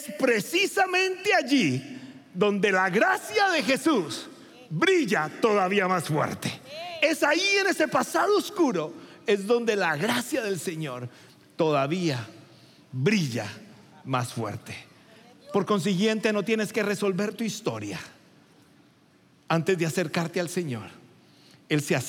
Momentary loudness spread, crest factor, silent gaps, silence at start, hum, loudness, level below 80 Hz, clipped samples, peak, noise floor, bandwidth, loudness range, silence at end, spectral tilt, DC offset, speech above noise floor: 15 LU; 18 dB; none; 0 s; none; -25 LUFS; -78 dBFS; under 0.1%; -8 dBFS; -59 dBFS; 17 kHz; 6 LU; 0 s; -4.5 dB/octave; under 0.1%; 34 dB